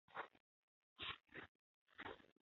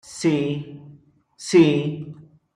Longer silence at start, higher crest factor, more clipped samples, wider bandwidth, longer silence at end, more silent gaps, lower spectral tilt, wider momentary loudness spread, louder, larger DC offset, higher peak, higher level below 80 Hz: about the same, 0.1 s vs 0.1 s; about the same, 22 dB vs 18 dB; neither; second, 6.8 kHz vs 11 kHz; second, 0.1 s vs 0.4 s; first, 0.40-0.96 s, 1.49-1.86 s vs none; second, 0 dB/octave vs -6 dB/octave; second, 11 LU vs 21 LU; second, -54 LUFS vs -20 LUFS; neither; second, -36 dBFS vs -4 dBFS; second, -82 dBFS vs -64 dBFS